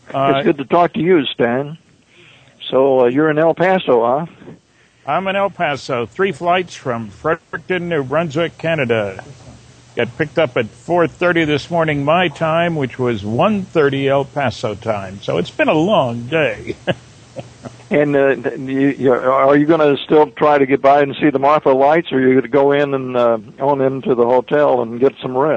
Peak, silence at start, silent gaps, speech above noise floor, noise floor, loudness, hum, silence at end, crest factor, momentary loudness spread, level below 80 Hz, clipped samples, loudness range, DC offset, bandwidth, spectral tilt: -2 dBFS; 0.1 s; none; 37 dB; -52 dBFS; -16 LUFS; none; 0 s; 14 dB; 10 LU; -52 dBFS; under 0.1%; 6 LU; under 0.1%; 9 kHz; -7 dB/octave